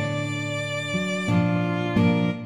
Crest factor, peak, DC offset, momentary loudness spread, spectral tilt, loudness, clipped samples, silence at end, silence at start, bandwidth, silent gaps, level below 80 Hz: 14 dB; -10 dBFS; 0.1%; 6 LU; -6.5 dB/octave; -24 LUFS; under 0.1%; 0 s; 0 s; 10.5 kHz; none; -54 dBFS